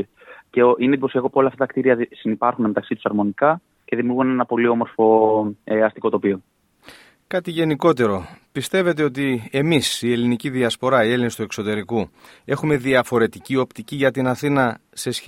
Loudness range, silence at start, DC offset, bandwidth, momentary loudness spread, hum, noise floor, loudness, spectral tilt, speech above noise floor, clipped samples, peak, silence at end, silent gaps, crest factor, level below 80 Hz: 3 LU; 0 s; under 0.1%; 16.5 kHz; 9 LU; none; -47 dBFS; -20 LUFS; -5.5 dB/octave; 28 dB; under 0.1%; -2 dBFS; 0 s; none; 18 dB; -60 dBFS